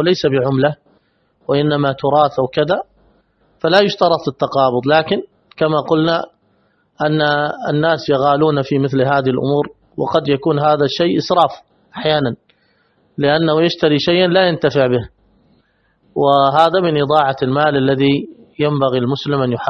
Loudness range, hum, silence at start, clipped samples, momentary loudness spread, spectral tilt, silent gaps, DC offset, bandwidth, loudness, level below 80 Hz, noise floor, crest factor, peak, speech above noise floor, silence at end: 2 LU; none; 0 s; under 0.1%; 8 LU; -7 dB/octave; none; under 0.1%; 6.4 kHz; -15 LUFS; -52 dBFS; -59 dBFS; 16 dB; 0 dBFS; 45 dB; 0 s